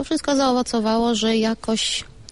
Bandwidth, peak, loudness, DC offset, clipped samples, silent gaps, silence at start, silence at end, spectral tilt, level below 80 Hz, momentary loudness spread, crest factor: 11.5 kHz; -10 dBFS; -20 LUFS; 0.4%; under 0.1%; none; 0 s; 0.1 s; -3.5 dB/octave; -48 dBFS; 3 LU; 12 dB